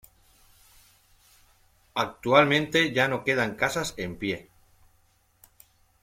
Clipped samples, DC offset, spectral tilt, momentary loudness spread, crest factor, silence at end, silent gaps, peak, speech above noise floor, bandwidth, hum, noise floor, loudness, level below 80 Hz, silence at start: under 0.1%; under 0.1%; -4.5 dB/octave; 12 LU; 24 dB; 1.6 s; none; -6 dBFS; 40 dB; 16.5 kHz; none; -65 dBFS; -25 LUFS; -58 dBFS; 1.95 s